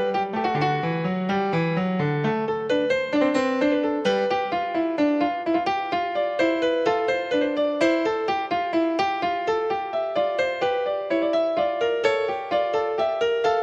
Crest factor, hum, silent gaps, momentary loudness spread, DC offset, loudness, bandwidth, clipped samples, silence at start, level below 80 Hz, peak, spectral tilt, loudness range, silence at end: 16 dB; none; none; 3 LU; under 0.1%; -23 LUFS; 8.6 kHz; under 0.1%; 0 s; -60 dBFS; -8 dBFS; -6.5 dB/octave; 1 LU; 0 s